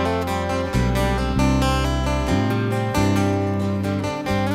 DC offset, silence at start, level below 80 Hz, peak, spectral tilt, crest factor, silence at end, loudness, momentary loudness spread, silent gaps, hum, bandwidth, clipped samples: under 0.1%; 0 s; -28 dBFS; -8 dBFS; -6 dB/octave; 14 dB; 0 s; -21 LUFS; 4 LU; none; none; 16 kHz; under 0.1%